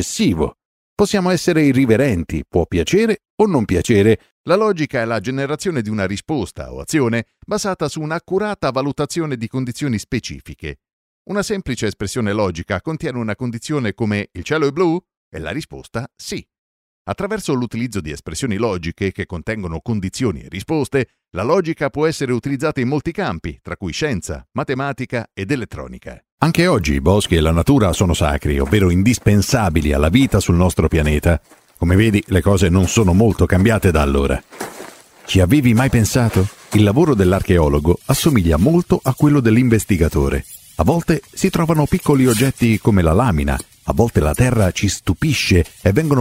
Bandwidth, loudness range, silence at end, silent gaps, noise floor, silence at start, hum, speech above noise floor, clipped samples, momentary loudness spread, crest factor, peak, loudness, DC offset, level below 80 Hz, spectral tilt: 16 kHz; 8 LU; 0 s; 0.65-0.97 s, 3.30-3.38 s, 4.31-4.44 s, 10.93-11.25 s, 15.17-15.32 s, 16.58-17.05 s, 26.32-26.38 s; -38 dBFS; 0 s; none; 21 dB; under 0.1%; 11 LU; 16 dB; 0 dBFS; -17 LUFS; under 0.1%; -30 dBFS; -6 dB/octave